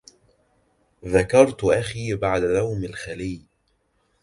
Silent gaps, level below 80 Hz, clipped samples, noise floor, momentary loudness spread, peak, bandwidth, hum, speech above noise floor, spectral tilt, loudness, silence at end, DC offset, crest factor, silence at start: none; -46 dBFS; under 0.1%; -68 dBFS; 15 LU; -2 dBFS; 11.5 kHz; none; 47 dB; -6 dB/octave; -22 LUFS; 0.85 s; under 0.1%; 22 dB; 1.05 s